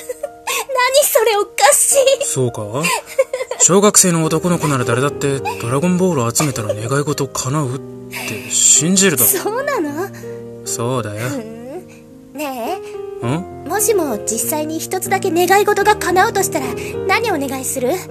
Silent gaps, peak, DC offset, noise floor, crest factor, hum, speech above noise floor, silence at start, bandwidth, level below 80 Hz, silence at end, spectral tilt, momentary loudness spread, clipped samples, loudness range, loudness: none; 0 dBFS; under 0.1%; -39 dBFS; 16 dB; none; 23 dB; 0 s; 14.5 kHz; -50 dBFS; 0 s; -3.5 dB/octave; 15 LU; under 0.1%; 9 LU; -15 LUFS